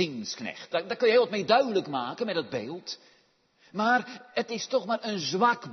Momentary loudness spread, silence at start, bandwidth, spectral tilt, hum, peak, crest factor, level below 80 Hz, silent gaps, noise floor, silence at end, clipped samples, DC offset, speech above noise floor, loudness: 13 LU; 0 s; 6.4 kHz; -4 dB/octave; none; -8 dBFS; 20 dB; -78 dBFS; none; -65 dBFS; 0 s; under 0.1%; under 0.1%; 38 dB; -28 LUFS